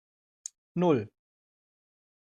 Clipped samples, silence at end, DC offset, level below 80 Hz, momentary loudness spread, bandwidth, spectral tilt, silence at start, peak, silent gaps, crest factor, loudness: under 0.1%; 1.3 s; under 0.1%; -76 dBFS; 18 LU; 11 kHz; -6.5 dB/octave; 0.75 s; -12 dBFS; none; 22 dB; -29 LUFS